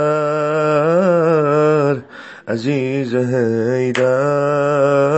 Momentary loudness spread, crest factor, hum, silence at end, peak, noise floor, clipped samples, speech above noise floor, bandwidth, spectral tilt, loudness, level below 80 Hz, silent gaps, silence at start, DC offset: 7 LU; 12 dB; none; 0 s; -2 dBFS; -35 dBFS; under 0.1%; 19 dB; 8.4 kHz; -7.5 dB/octave; -16 LUFS; -66 dBFS; none; 0 s; under 0.1%